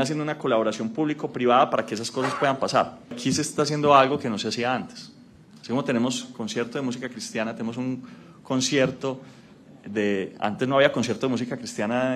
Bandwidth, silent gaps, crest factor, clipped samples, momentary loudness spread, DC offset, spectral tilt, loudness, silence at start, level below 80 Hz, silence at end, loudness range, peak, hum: 13.5 kHz; none; 24 dB; under 0.1%; 12 LU; under 0.1%; -4.5 dB/octave; -25 LUFS; 0 s; -66 dBFS; 0 s; 6 LU; -2 dBFS; none